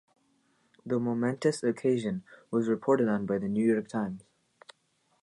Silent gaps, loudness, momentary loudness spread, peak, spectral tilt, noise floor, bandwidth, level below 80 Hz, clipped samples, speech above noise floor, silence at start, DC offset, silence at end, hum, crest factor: none; -29 LUFS; 10 LU; -12 dBFS; -7 dB/octave; -72 dBFS; 11 kHz; -70 dBFS; under 0.1%; 44 dB; 0.85 s; under 0.1%; 1.05 s; none; 18 dB